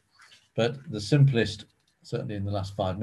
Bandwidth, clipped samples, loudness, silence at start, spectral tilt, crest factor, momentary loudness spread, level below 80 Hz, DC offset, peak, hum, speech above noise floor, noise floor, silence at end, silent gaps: 11 kHz; under 0.1%; -27 LUFS; 0.55 s; -7 dB/octave; 18 dB; 14 LU; -52 dBFS; under 0.1%; -8 dBFS; none; 31 dB; -58 dBFS; 0 s; none